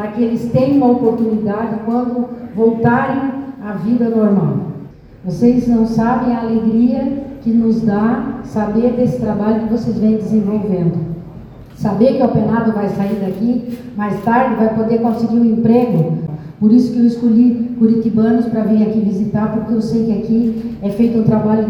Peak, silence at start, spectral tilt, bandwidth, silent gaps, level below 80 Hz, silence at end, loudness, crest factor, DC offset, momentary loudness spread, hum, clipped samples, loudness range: 0 dBFS; 0 s; -9.5 dB/octave; 6.4 kHz; none; -44 dBFS; 0 s; -15 LUFS; 14 dB; under 0.1%; 9 LU; none; under 0.1%; 3 LU